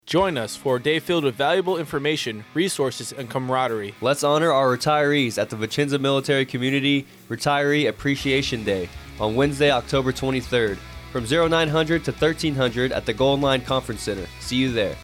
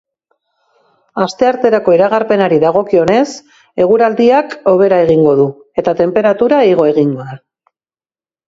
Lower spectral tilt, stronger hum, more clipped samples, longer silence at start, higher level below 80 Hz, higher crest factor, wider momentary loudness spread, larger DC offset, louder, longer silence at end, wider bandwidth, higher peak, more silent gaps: second, -5 dB/octave vs -7 dB/octave; neither; neither; second, 0.05 s vs 1.15 s; first, -46 dBFS vs -52 dBFS; about the same, 14 dB vs 12 dB; about the same, 8 LU vs 9 LU; neither; second, -22 LUFS vs -11 LUFS; second, 0 s vs 1.1 s; first, 16.5 kHz vs 7.8 kHz; second, -8 dBFS vs 0 dBFS; neither